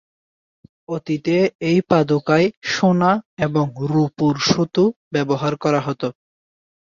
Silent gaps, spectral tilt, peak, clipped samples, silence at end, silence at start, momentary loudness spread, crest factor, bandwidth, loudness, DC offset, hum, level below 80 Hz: 1.55-1.59 s, 2.57-2.61 s, 3.25-3.37 s, 4.96-5.11 s; -6 dB/octave; -2 dBFS; under 0.1%; 0.85 s; 0.9 s; 8 LU; 18 dB; 7.4 kHz; -19 LUFS; under 0.1%; none; -56 dBFS